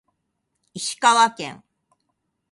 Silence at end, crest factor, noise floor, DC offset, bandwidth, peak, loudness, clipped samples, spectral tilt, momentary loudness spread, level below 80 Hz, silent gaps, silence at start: 0.95 s; 22 dB; -76 dBFS; under 0.1%; 11.5 kHz; -2 dBFS; -19 LUFS; under 0.1%; -1 dB/octave; 18 LU; -74 dBFS; none; 0.75 s